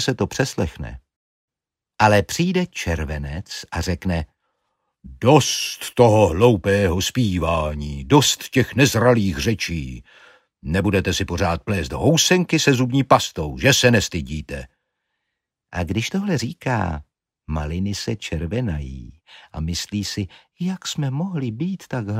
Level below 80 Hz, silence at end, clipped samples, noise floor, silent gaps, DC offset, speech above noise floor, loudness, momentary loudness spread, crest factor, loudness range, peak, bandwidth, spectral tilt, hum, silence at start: -38 dBFS; 0 s; under 0.1%; -88 dBFS; 1.16-1.48 s; under 0.1%; 68 dB; -20 LUFS; 14 LU; 20 dB; 9 LU; -2 dBFS; 16 kHz; -4.5 dB/octave; none; 0 s